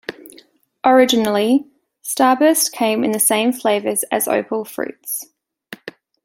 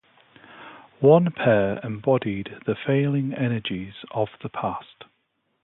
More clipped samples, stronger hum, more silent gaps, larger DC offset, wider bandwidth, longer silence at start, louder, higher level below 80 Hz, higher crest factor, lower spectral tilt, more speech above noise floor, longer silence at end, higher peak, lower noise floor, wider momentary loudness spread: neither; neither; neither; neither; first, 17 kHz vs 4.1 kHz; second, 0.1 s vs 0.55 s; first, -17 LUFS vs -23 LUFS; second, -66 dBFS vs -58 dBFS; second, 16 dB vs 22 dB; second, -2.5 dB/octave vs -11.5 dB/octave; second, 34 dB vs 50 dB; second, 0.35 s vs 0.6 s; about the same, -2 dBFS vs -4 dBFS; second, -50 dBFS vs -72 dBFS; first, 19 LU vs 15 LU